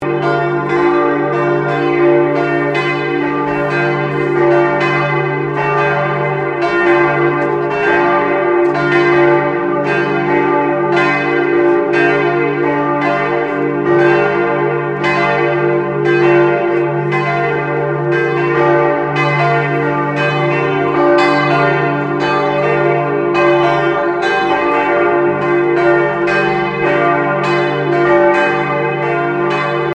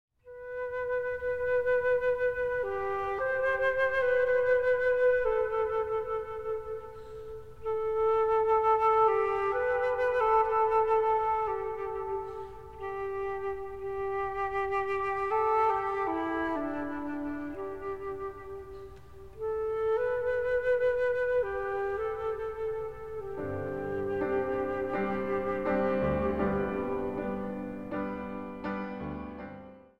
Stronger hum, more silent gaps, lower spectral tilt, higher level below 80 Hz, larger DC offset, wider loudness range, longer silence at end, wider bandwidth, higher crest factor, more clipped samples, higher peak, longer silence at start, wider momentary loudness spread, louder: neither; neither; about the same, -7.5 dB/octave vs -7.5 dB/octave; about the same, -50 dBFS vs -54 dBFS; second, under 0.1% vs 0.3%; second, 1 LU vs 8 LU; about the same, 0 s vs 0 s; first, 8.2 kHz vs 6.8 kHz; about the same, 12 dB vs 16 dB; neither; first, 0 dBFS vs -14 dBFS; about the same, 0 s vs 0.1 s; second, 4 LU vs 13 LU; first, -13 LUFS vs -30 LUFS